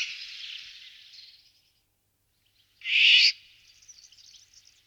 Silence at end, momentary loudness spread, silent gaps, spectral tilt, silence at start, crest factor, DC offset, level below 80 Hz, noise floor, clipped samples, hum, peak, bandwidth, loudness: 1.55 s; 25 LU; none; 5 dB/octave; 0 s; 22 dB; under 0.1%; -78 dBFS; -73 dBFS; under 0.1%; none; -8 dBFS; 17.5 kHz; -19 LUFS